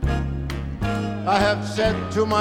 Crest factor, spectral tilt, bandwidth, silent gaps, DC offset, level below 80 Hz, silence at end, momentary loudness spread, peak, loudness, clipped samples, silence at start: 18 dB; -6 dB/octave; 16 kHz; none; under 0.1%; -32 dBFS; 0 s; 8 LU; -4 dBFS; -23 LUFS; under 0.1%; 0 s